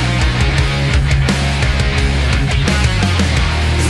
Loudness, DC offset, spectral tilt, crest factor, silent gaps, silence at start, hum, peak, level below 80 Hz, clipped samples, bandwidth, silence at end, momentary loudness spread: -14 LUFS; under 0.1%; -5 dB/octave; 12 dB; none; 0 s; none; -2 dBFS; -18 dBFS; under 0.1%; 12 kHz; 0 s; 1 LU